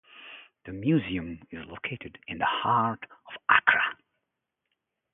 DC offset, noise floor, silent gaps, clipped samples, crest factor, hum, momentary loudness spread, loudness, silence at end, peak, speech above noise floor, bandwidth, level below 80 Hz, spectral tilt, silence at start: under 0.1%; -84 dBFS; none; under 0.1%; 26 dB; none; 22 LU; -26 LUFS; 1.2 s; -2 dBFS; 56 dB; 3.9 kHz; -58 dBFS; -3 dB/octave; 0.15 s